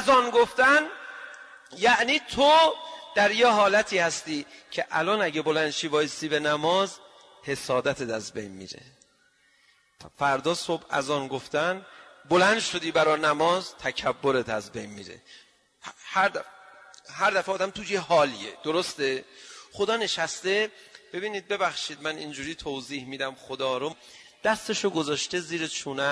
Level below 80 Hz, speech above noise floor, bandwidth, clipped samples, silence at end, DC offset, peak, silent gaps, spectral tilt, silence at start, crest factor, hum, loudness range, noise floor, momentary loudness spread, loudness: -64 dBFS; 38 dB; 11 kHz; under 0.1%; 0 s; under 0.1%; -10 dBFS; none; -3 dB/octave; 0 s; 16 dB; none; 9 LU; -64 dBFS; 19 LU; -25 LUFS